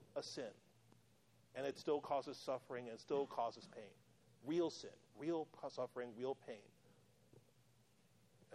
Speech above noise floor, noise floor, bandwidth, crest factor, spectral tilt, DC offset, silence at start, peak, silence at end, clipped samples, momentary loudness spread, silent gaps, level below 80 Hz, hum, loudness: 29 dB; -74 dBFS; 13.5 kHz; 20 dB; -5 dB/octave; under 0.1%; 0 s; -28 dBFS; 0 s; under 0.1%; 15 LU; none; -90 dBFS; none; -46 LUFS